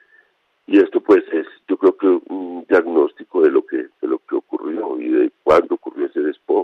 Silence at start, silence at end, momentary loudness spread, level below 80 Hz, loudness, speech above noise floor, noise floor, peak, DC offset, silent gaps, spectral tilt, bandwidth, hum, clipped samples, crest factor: 0.7 s; 0 s; 10 LU; -60 dBFS; -18 LUFS; 42 dB; -59 dBFS; -4 dBFS; under 0.1%; none; -7 dB/octave; 6.2 kHz; none; under 0.1%; 14 dB